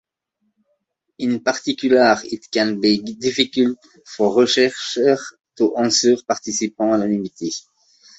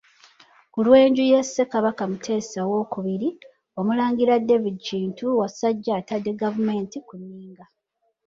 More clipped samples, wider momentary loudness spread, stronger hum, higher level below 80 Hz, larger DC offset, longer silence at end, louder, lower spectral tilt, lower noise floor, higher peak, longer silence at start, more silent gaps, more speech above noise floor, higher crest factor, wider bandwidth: neither; second, 11 LU vs 17 LU; neither; about the same, -62 dBFS vs -66 dBFS; neither; about the same, 0.6 s vs 0.65 s; first, -19 LUFS vs -22 LUFS; second, -3.5 dB/octave vs -6 dB/octave; about the same, -72 dBFS vs -73 dBFS; about the same, -2 dBFS vs -4 dBFS; first, 1.2 s vs 0.75 s; neither; about the same, 53 dB vs 51 dB; about the same, 18 dB vs 18 dB; about the same, 8.2 kHz vs 7.8 kHz